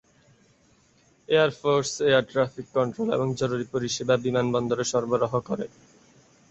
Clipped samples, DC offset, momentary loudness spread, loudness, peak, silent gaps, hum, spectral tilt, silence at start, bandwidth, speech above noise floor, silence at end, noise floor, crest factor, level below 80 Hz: under 0.1%; under 0.1%; 6 LU; -25 LUFS; -8 dBFS; none; none; -5 dB/octave; 1.3 s; 8.2 kHz; 37 dB; 0.85 s; -61 dBFS; 18 dB; -62 dBFS